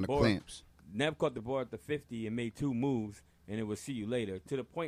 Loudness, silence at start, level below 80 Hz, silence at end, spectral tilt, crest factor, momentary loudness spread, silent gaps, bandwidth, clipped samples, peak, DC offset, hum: -36 LUFS; 0 s; -56 dBFS; 0 s; -6 dB/octave; 20 dB; 13 LU; none; 15.5 kHz; under 0.1%; -14 dBFS; under 0.1%; none